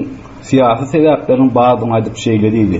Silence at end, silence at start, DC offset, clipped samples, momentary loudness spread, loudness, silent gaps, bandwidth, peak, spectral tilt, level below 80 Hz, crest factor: 0 s; 0 s; under 0.1%; under 0.1%; 6 LU; -12 LUFS; none; 8 kHz; -2 dBFS; -7 dB/octave; -42 dBFS; 10 dB